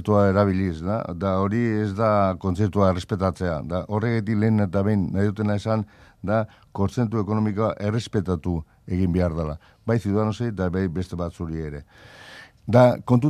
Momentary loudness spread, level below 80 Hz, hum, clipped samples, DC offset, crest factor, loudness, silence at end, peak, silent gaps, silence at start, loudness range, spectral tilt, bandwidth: 11 LU; -48 dBFS; none; under 0.1%; under 0.1%; 20 dB; -23 LUFS; 0 s; -2 dBFS; none; 0 s; 3 LU; -8.5 dB/octave; 10.5 kHz